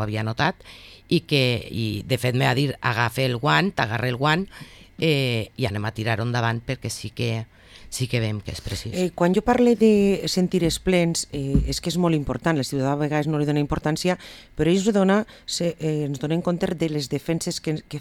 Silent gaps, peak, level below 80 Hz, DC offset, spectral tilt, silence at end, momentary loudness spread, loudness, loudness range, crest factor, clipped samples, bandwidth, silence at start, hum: none; -4 dBFS; -42 dBFS; under 0.1%; -5.5 dB/octave; 0 s; 10 LU; -23 LUFS; 5 LU; 18 dB; under 0.1%; 16.5 kHz; 0 s; none